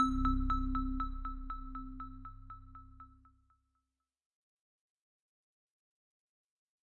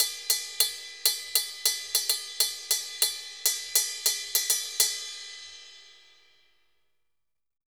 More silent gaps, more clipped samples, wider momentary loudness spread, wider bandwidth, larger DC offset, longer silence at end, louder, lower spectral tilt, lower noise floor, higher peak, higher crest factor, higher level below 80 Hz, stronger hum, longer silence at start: neither; neither; first, 23 LU vs 12 LU; second, 7 kHz vs over 20 kHz; neither; first, 3.9 s vs 1.75 s; second, -38 LUFS vs -26 LUFS; first, -7 dB/octave vs 4.5 dB/octave; first, -88 dBFS vs -84 dBFS; second, -18 dBFS vs -6 dBFS; about the same, 22 dB vs 24 dB; first, -44 dBFS vs -72 dBFS; second, none vs 50 Hz at -90 dBFS; about the same, 0 s vs 0 s